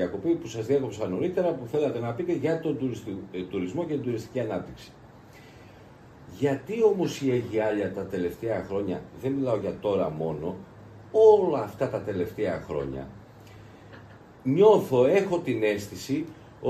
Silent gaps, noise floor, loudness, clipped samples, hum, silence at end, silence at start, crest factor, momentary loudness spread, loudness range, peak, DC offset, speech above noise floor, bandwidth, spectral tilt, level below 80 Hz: none; -50 dBFS; -27 LUFS; under 0.1%; none; 0 s; 0 s; 20 dB; 14 LU; 7 LU; -6 dBFS; under 0.1%; 24 dB; 14.5 kHz; -7 dB/octave; -58 dBFS